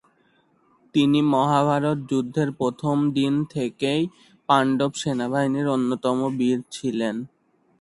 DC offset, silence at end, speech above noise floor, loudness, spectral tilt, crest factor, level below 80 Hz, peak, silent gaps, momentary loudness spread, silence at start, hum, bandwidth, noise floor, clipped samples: under 0.1%; 0.55 s; 41 dB; -23 LUFS; -6 dB/octave; 20 dB; -62 dBFS; -2 dBFS; none; 8 LU; 0.95 s; none; 11.5 kHz; -63 dBFS; under 0.1%